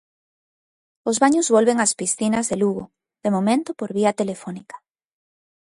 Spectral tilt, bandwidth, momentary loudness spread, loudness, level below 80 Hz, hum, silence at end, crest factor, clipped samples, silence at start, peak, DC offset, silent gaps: -4 dB/octave; 11.5 kHz; 14 LU; -20 LUFS; -64 dBFS; none; 0.9 s; 20 dB; under 0.1%; 1.05 s; -2 dBFS; under 0.1%; none